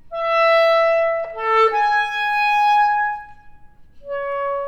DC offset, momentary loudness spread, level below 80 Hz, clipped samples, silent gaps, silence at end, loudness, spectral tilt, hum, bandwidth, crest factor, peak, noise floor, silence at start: under 0.1%; 10 LU; -54 dBFS; under 0.1%; none; 0 s; -17 LUFS; -1 dB/octave; none; 14 kHz; 14 dB; -6 dBFS; -42 dBFS; 0.05 s